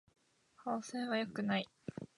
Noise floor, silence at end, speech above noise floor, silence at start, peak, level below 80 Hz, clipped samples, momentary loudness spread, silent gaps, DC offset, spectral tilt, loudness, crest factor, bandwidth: -68 dBFS; 0.15 s; 29 dB; 0.6 s; -22 dBFS; -78 dBFS; under 0.1%; 11 LU; none; under 0.1%; -5 dB/octave; -39 LUFS; 18 dB; 11 kHz